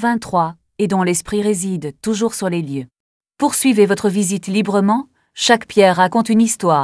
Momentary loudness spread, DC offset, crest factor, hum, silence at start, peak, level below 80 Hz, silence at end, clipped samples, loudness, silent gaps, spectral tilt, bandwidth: 9 LU; under 0.1%; 16 dB; none; 0 s; 0 dBFS; -54 dBFS; 0 s; under 0.1%; -16 LUFS; 3.00-3.20 s; -4.5 dB/octave; 11 kHz